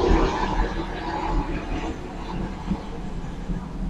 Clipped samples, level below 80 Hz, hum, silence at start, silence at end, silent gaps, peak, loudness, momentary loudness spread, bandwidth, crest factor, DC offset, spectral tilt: under 0.1%; -28 dBFS; none; 0 s; 0 s; none; -6 dBFS; -28 LUFS; 11 LU; 8.2 kHz; 20 dB; under 0.1%; -6.5 dB/octave